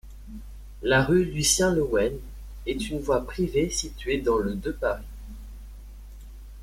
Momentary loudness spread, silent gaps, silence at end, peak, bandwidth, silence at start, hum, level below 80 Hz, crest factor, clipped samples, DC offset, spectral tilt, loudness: 25 LU; none; 0 s; -8 dBFS; 16.5 kHz; 0.05 s; none; -40 dBFS; 18 dB; under 0.1%; under 0.1%; -4 dB/octave; -25 LUFS